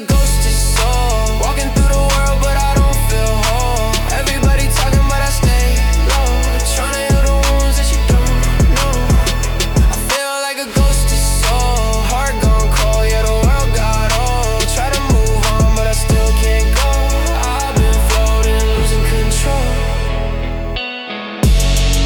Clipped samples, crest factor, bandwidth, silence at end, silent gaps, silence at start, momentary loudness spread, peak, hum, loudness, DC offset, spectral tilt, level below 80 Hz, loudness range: under 0.1%; 10 dB; 19 kHz; 0 s; none; 0 s; 3 LU; -2 dBFS; none; -15 LUFS; under 0.1%; -4.5 dB/octave; -14 dBFS; 1 LU